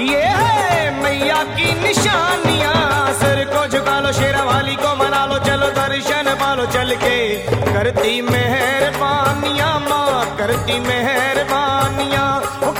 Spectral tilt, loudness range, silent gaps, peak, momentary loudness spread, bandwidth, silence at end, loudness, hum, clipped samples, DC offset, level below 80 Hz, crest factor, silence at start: -4 dB/octave; 1 LU; none; -4 dBFS; 3 LU; 17 kHz; 0 s; -16 LUFS; none; under 0.1%; under 0.1%; -40 dBFS; 12 dB; 0 s